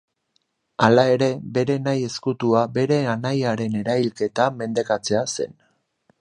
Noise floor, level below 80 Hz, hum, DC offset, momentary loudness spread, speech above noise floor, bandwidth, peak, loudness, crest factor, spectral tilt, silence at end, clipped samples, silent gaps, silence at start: -70 dBFS; -62 dBFS; none; under 0.1%; 9 LU; 49 dB; 11.5 kHz; 0 dBFS; -21 LUFS; 22 dB; -5.5 dB/octave; 0.7 s; under 0.1%; none; 0.8 s